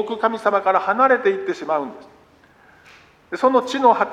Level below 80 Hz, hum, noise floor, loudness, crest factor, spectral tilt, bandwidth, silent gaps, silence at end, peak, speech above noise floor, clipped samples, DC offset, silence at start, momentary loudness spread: -66 dBFS; none; -52 dBFS; -18 LUFS; 18 dB; -4.5 dB/octave; 10.5 kHz; none; 0 s; -2 dBFS; 34 dB; under 0.1%; under 0.1%; 0 s; 9 LU